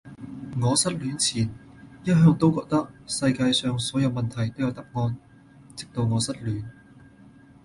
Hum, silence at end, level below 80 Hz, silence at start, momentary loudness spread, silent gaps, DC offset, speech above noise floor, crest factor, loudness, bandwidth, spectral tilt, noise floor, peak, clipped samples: none; 0.9 s; -54 dBFS; 0.05 s; 15 LU; none; under 0.1%; 27 dB; 18 dB; -25 LUFS; 11.5 kHz; -5 dB/octave; -51 dBFS; -8 dBFS; under 0.1%